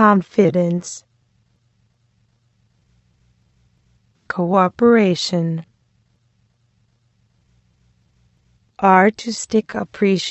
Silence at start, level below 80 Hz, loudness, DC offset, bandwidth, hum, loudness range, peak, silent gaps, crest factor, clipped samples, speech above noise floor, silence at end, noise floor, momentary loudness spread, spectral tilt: 0 s; -60 dBFS; -17 LUFS; under 0.1%; 8.4 kHz; none; 10 LU; 0 dBFS; none; 20 dB; under 0.1%; 46 dB; 0 s; -62 dBFS; 14 LU; -5.5 dB/octave